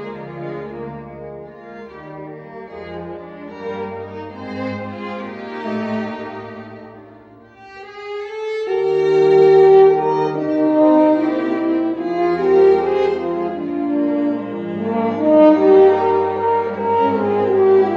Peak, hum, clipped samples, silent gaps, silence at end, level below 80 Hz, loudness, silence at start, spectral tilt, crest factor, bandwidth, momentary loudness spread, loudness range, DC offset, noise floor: -2 dBFS; none; under 0.1%; none; 0 s; -58 dBFS; -16 LUFS; 0 s; -8 dB/octave; 16 dB; 6.2 kHz; 22 LU; 17 LU; under 0.1%; -43 dBFS